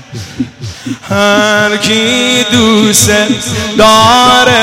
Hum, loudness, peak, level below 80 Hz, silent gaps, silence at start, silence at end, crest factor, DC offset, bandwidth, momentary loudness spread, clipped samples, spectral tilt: none; -7 LUFS; 0 dBFS; -36 dBFS; none; 0 s; 0 s; 8 dB; under 0.1%; 17 kHz; 16 LU; 0.5%; -3 dB/octave